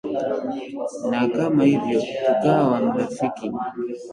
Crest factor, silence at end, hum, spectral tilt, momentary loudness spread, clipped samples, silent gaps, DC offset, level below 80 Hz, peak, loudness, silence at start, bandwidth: 16 dB; 0 s; none; -7 dB/octave; 11 LU; under 0.1%; none; under 0.1%; -62 dBFS; -6 dBFS; -22 LUFS; 0.05 s; 11 kHz